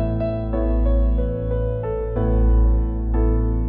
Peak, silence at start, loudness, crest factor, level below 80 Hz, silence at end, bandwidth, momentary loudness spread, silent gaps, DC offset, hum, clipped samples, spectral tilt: -8 dBFS; 0 s; -22 LUFS; 10 dB; -20 dBFS; 0 s; 2.8 kHz; 5 LU; none; under 0.1%; none; under 0.1%; -10.5 dB/octave